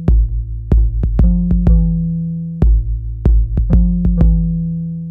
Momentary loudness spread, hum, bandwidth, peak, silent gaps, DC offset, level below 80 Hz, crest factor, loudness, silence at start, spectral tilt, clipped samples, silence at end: 7 LU; none; 1.8 kHz; -2 dBFS; none; under 0.1%; -14 dBFS; 10 dB; -16 LUFS; 0 s; -12 dB/octave; under 0.1%; 0 s